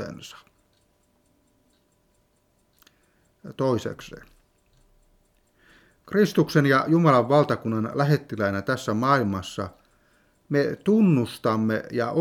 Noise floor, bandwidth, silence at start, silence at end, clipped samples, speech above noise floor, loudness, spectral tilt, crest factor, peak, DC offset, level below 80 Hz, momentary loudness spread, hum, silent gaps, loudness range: -66 dBFS; 16 kHz; 0 s; 0 s; under 0.1%; 44 dB; -23 LUFS; -7 dB/octave; 20 dB; -4 dBFS; under 0.1%; -62 dBFS; 17 LU; none; none; 12 LU